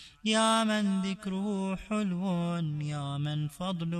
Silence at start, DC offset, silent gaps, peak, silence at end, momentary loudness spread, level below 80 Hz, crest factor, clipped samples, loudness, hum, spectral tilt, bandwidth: 0 s; under 0.1%; none; -14 dBFS; 0 s; 9 LU; -60 dBFS; 16 dB; under 0.1%; -30 LUFS; none; -5 dB/octave; 13 kHz